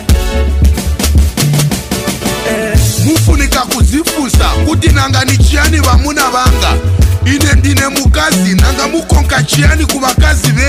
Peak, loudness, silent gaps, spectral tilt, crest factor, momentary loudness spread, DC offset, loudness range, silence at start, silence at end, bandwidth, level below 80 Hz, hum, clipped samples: 0 dBFS; -10 LUFS; none; -4.5 dB/octave; 8 dB; 4 LU; under 0.1%; 2 LU; 0 s; 0 s; 16 kHz; -12 dBFS; none; under 0.1%